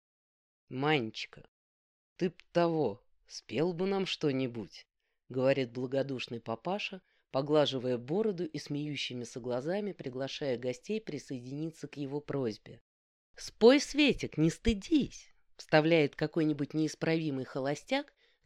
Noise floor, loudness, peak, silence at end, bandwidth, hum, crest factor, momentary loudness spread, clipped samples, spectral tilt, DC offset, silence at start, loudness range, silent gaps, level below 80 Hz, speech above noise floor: under -90 dBFS; -32 LUFS; -10 dBFS; 0.4 s; 12 kHz; none; 22 dB; 13 LU; under 0.1%; -5.5 dB/octave; under 0.1%; 0.7 s; 8 LU; 1.48-2.16 s, 12.81-13.34 s; -56 dBFS; over 58 dB